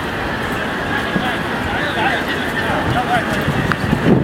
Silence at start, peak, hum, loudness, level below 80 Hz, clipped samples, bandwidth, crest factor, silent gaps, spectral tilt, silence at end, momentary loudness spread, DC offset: 0 s; 0 dBFS; none; -18 LUFS; -36 dBFS; under 0.1%; 16.5 kHz; 18 dB; none; -5.5 dB/octave; 0 s; 4 LU; under 0.1%